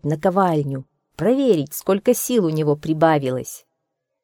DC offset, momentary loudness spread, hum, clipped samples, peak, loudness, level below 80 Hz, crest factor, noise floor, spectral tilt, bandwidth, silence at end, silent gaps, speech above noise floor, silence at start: under 0.1%; 11 LU; none; under 0.1%; -2 dBFS; -20 LUFS; -58 dBFS; 18 dB; -77 dBFS; -6 dB/octave; 19 kHz; 0.65 s; none; 58 dB; 0.05 s